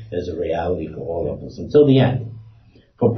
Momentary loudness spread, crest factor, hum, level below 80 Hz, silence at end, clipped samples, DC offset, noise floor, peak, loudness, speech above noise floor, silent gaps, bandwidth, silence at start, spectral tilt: 14 LU; 16 dB; none; -42 dBFS; 0 s; under 0.1%; under 0.1%; -50 dBFS; -2 dBFS; -19 LUFS; 31 dB; none; 6.2 kHz; 0 s; -9 dB/octave